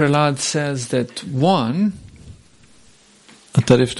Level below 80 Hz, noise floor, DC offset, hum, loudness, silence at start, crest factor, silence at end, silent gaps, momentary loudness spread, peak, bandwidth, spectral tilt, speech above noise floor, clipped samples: -50 dBFS; -51 dBFS; under 0.1%; none; -19 LUFS; 0 s; 18 dB; 0 s; none; 7 LU; 0 dBFS; 11.5 kHz; -5.5 dB/octave; 34 dB; under 0.1%